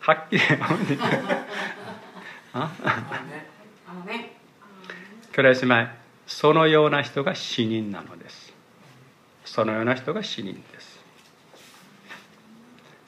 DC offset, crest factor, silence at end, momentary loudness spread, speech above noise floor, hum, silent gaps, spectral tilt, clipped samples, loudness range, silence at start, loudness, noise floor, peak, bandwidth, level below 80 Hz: under 0.1%; 22 dB; 0.9 s; 26 LU; 31 dB; none; none; -5.5 dB/octave; under 0.1%; 11 LU; 0 s; -23 LUFS; -54 dBFS; -4 dBFS; 13.5 kHz; -74 dBFS